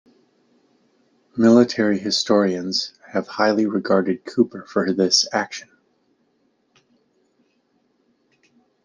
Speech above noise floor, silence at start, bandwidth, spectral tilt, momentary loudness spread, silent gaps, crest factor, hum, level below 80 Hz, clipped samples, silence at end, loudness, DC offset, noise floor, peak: 47 dB; 1.35 s; 10 kHz; -4 dB/octave; 11 LU; none; 20 dB; none; -68 dBFS; under 0.1%; 3.2 s; -19 LUFS; under 0.1%; -66 dBFS; -2 dBFS